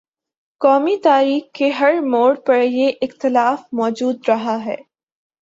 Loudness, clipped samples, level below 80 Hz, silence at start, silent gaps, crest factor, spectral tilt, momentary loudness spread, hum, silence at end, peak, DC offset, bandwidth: -17 LUFS; under 0.1%; -68 dBFS; 0.6 s; none; 14 dB; -5 dB/octave; 7 LU; none; 0.65 s; -2 dBFS; under 0.1%; 7.8 kHz